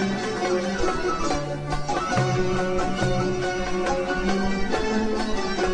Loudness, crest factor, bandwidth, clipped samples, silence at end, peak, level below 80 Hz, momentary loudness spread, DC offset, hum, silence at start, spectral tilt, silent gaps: -25 LUFS; 14 dB; 10 kHz; under 0.1%; 0 s; -10 dBFS; -36 dBFS; 3 LU; under 0.1%; none; 0 s; -5 dB/octave; none